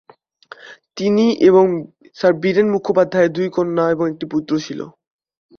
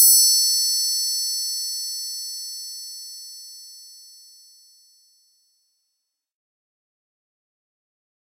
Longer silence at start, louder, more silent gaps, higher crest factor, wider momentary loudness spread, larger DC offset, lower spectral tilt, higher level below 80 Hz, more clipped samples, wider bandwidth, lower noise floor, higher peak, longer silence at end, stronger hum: first, 0.65 s vs 0 s; about the same, -17 LUFS vs -19 LUFS; neither; second, 16 dB vs 24 dB; second, 16 LU vs 24 LU; neither; first, -6.5 dB/octave vs 13.5 dB/octave; first, -60 dBFS vs under -90 dBFS; neither; second, 6.8 kHz vs 16 kHz; second, -43 dBFS vs -78 dBFS; about the same, -2 dBFS vs -2 dBFS; second, 0.7 s vs 4.2 s; neither